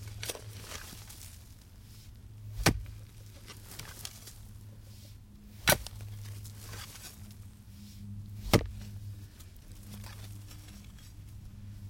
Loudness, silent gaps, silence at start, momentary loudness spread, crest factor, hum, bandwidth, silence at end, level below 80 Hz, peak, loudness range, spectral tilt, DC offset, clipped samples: -36 LUFS; none; 0 s; 22 LU; 30 dB; none; 17 kHz; 0 s; -48 dBFS; -8 dBFS; 2 LU; -3.5 dB/octave; under 0.1%; under 0.1%